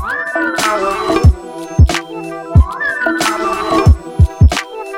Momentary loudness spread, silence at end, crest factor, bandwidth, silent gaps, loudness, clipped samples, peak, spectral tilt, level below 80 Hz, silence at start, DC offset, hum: 9 LU; 0 s; 12 dB; 15.5 kHz; none; -14 LUFS; under 0.1%; 0 dBFS; -5.5 dB/octave; -18 dBFS; 0 s; under 0.1%; none